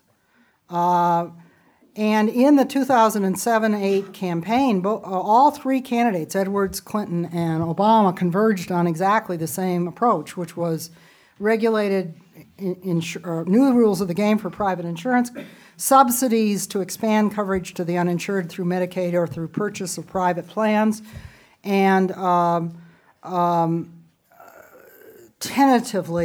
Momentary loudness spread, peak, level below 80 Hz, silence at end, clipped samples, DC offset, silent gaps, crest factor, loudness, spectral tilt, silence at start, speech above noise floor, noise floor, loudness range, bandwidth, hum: 11 LU; -2 dBFS; -58 dBFS; 0 s; under 0.1%; under 0.1%; none; 20 dB; -21 LUFS; -5.5 dB/octave; 0.7 s; 41 dB; -61 dBFS; 4 LU; over 20 kHz; none